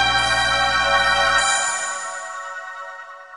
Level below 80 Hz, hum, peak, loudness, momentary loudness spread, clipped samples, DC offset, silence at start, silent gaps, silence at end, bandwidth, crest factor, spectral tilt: -42 dBFS; none; -4 dBFS; -18 LUFS; 17 LU; under 0.1%; under 0.1%; 0 s; none; 0 s; 11.5 kHz; 16 dB; -0.5 dB/octave